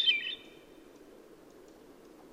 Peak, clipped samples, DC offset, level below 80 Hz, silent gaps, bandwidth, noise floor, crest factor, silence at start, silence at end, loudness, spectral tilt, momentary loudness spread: -16 dBFS; under 0.1%; under 0.1%; -72 dBFS; none; 16 kHz; -55 dBFS; 22 dB; 0 s; 0.05 s; -32 LUFS; -1 dB/octave; 24 LU